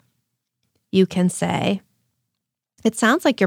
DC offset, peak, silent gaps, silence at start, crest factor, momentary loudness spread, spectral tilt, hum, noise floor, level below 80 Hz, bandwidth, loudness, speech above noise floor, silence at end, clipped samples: under 0.1%; -4 dBFS; none; 0.95 s; 18 dB; 7 LU; -5 dB/octave; none; -81 dBFS; -64 dBFS; 15.5 kHz; -20 LUFS; 63 dB; 0 s; under 0.1%